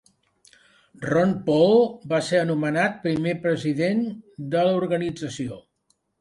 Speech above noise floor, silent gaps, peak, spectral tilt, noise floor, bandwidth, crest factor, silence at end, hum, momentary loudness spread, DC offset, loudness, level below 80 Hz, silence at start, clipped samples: 48 dB; none; -6 dBFS; -6.5 dB/octave; -70 dBFS; 11.5 kHz; 18 dB; 0.6 s; none; 13 LU; under 0.1%; -23 LUFS; -60 dBFS; 1 s; under 0.1%